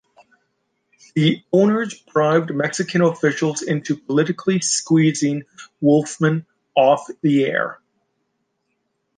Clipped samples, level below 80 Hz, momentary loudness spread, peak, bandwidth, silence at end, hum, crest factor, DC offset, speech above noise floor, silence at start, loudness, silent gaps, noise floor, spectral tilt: under 0.1%; -66 dBFS; 7 LU; -2 dBFS; 10 kHz; 1.4 s; none; 18 dB; under 0.1%; 54 dB; 1.15 s; -19 LUFS; none; -72 dBFS; -5 dB/octave